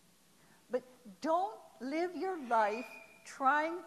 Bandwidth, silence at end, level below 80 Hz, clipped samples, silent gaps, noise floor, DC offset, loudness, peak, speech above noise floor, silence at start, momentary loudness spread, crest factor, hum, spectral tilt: 14 kHz; 0 s; -84 dBFS; under 0.1%; none; -66 dBFS; under 0.1%; -35 LUFS; -18 dBFS; 32 dB; 0.7 s; 15 LU; 18 dB; none; -4 dB/octave